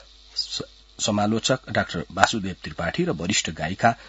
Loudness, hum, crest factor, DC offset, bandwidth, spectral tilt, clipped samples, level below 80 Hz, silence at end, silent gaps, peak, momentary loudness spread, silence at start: -24 LUFS; none; 26 dB; under 0.1%; 9.4 kHz; -3.5 dB/octave; under 0.1%; -52 dBFS; 0 s; none; 0 dBFS; 9 LU; 0.35 s